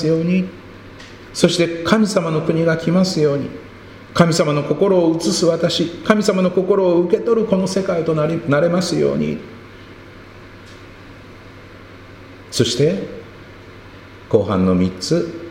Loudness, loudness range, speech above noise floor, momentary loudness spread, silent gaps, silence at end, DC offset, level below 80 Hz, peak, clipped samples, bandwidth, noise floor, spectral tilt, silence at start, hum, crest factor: -17 LUFS; 8 LU; 23 dB; 21 LU; none; 0 s; under 0.1%; -48 dBFS; 0 dBFS; under 0.1%; 16 kHz; -39 dBFS; -5.5 dB/octave; 0 s; none; 18 dB